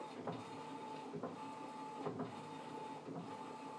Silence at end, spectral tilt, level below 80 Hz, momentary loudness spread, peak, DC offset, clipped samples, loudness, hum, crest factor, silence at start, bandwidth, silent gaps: 0 s; -6 dB/octave; under -90 dBFS; 4 LU; -30 dBFS; under 0.1%; under 0.1%; -48 LUFS; none; 18 dB; 0 s; 11 kHz; none